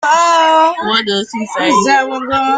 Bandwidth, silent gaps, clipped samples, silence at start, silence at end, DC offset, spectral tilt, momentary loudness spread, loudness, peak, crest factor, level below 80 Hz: 9.4 kHz; none; under 0.1%; 0 s; 0 s; under 0.1%; -2.5 dB/octave; 8 LU; -12 LUFS; 0 dBFS; 12 dB; -52 dBFS